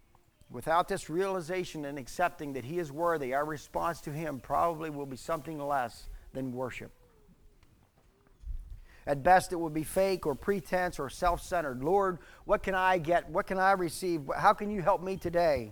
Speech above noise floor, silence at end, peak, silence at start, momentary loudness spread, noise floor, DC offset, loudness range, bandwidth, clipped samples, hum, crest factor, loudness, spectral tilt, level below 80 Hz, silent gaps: 34 dB; 0 s; -10 dBFS; 0.5 s; 13 LU; -64 dBFS; under 0.1%; 9 LU; over 20 kHz; under 0.1%; none; 22 dB; -31 LUFS; -5.5 dB/octave; -50 dBFS; none